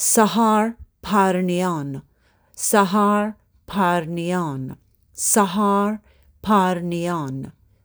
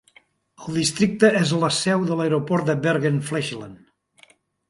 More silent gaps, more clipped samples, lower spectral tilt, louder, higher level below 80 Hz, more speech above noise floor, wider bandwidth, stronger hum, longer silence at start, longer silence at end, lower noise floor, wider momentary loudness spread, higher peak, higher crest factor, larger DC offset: neither; neither; about the same, -4.5 dB/octave vs -5 dB/octave; about the same, -20 LUFS vs -21 LUFS; first, -54 dBFS vs -60 dBFS; about the same, 36 dB vs 36 dB; first, over 20 kHz vs 11.5 kHz; neither; second, 0 s vs 0.6 s; second, 0.35 s vs 0.95 s; about the same, -56 dBFS vs -57 dBFS; first, 16 LU vs 12 LU; about the same, -2 dBFS vs -2 dBFS; about the same, 18 dB vs 20 dB; neither